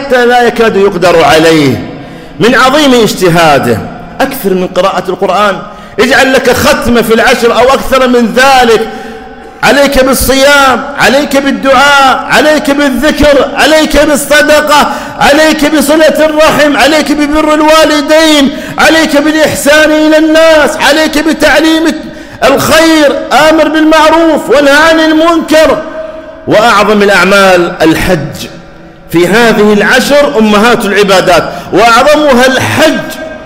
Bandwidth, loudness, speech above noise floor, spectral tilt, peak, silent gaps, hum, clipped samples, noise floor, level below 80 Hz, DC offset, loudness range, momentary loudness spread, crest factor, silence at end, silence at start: 16.5 kHz; -5 LUFS; 24 dB; -4 dB/octave; 0 dBFS; none; none; 0.2%; -29 dBFS; -28 dBFS; under 0.1%; 2 LU; 8 LU; 6 dB; 0 s; 0 s